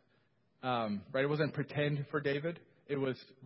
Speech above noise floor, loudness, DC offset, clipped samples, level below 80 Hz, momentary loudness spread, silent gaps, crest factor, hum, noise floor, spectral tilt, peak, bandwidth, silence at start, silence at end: 38 dB; -36 LUFS; under 0.1%; under 0.1%; -72 dBFS; 8 LU; none; 18 dB; none; -74 dBFS; -5 dB/octave; -18 dBFS; 5.6 kHz; 0.65 s; 0 s